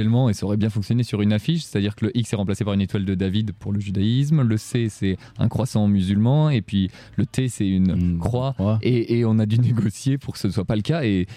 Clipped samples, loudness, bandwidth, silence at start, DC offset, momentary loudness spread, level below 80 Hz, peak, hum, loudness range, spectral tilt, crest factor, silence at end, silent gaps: under 0.1%; -22 LUFS; 13.5 kHz; 0 s; under 0.1%; 6 LU; -46 dBFS; -8 dBFS; none; 2 LU; -7.5 dB/octave; 12 dB; 0 s; none